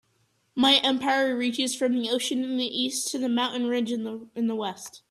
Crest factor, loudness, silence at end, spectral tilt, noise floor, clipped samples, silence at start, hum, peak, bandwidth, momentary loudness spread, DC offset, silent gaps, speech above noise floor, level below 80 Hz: 20 dB; -25 LUFS; 0.15 s; -2 dB/octave; -69 dBFS; under 0.1%; 0.55 s; none; -6 dBFS; 13.5 kHz; 12 LU; under 0.1%; none; 43 dB; -72 dBFS